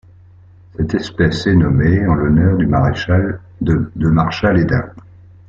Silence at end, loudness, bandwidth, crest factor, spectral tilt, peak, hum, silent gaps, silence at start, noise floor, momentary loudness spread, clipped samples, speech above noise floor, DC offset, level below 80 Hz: 0.5 s; -15 LUFS; 7.4 kHz; 14 dB; -8 dB/octave; -2 dBFS; none; none; 0.8 s; -43 dBFS; 8 LU; under 0.1%; 29 dB; under 0.1%; -34 dBFS